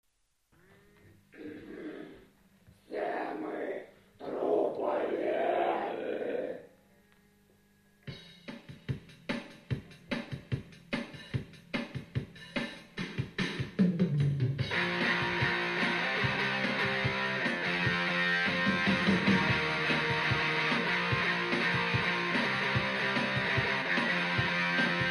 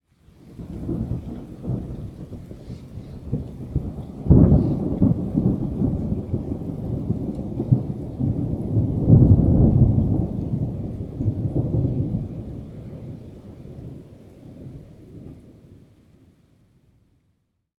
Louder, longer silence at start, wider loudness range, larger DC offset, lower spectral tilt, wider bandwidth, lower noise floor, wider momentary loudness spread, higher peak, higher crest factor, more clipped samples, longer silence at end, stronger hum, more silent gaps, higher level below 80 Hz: second, -31 LUFS vs -22 LUFS; first, 1.35 s vs 0.45 s; second, 14 LU vs 19 LU; neither; second, -5.5 dB/octave vs -12 dB/octave; first, 12.5 kHz vs 3.9 kHz; first, -75 dBFS vs -69 dBFS; second, 15 LU vs 24 LU; second, -16 dBFS vs 0 dBFS; second, 16 dB vs 22 dB; neither; second, 0 s vs 2.05 s; neither; neither; second, -58 dBFS vs -32 dBFS